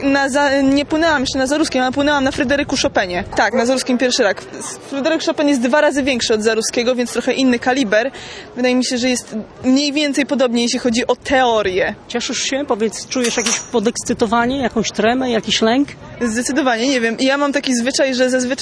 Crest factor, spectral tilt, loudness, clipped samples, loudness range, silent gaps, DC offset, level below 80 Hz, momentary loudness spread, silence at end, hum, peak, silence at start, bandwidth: 16 dB; -3 dB/octave; -16 LUFS; under 0.1%; 1 LU; none; under 0.1%; -44 dBFS; 5 LU; 0 s; none; -2 dBFS; 0 s; 11 kHz